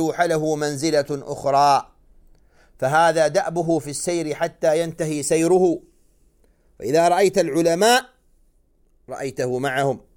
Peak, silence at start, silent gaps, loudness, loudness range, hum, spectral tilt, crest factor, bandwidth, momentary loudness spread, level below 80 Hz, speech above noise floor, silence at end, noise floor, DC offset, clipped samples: -4 dBFS; 0 s; none; -20 LUFS; 2 LU; none; -4.5 dB/octave; 16 dB; 17.5 kHz; 9 LU; -56 dBFS; 40 dB; 0.2 s; -59 dBFS; under 0.1%; under 0.1%